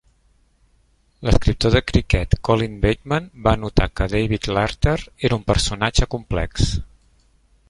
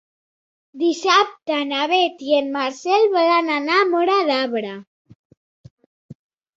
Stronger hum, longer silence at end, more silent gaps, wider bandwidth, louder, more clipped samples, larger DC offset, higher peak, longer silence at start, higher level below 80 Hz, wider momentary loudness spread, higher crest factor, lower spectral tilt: neither; first, 0.85 s vs 0.45 s; second, none vs 4.87-5.05 s, 5.15-5.30 s, 5.37-5.64 s, 5.71-5.77 s, 5.86-6.09 s; first, 11.5 kHz vs 7.8 kHz; second, -21 LUFS vs -18 LUFS; neither; neither; about the same, 0 dBFS vs -2 dBFS; first, 1.2 s vs 0.75 s; first, -26 dBFS vs -70 dBFS; second, 5 LU vs 8 LU; about the same, 20 dB vs 18 dB; first, -5.5 dB/octave vs -3 dB/octave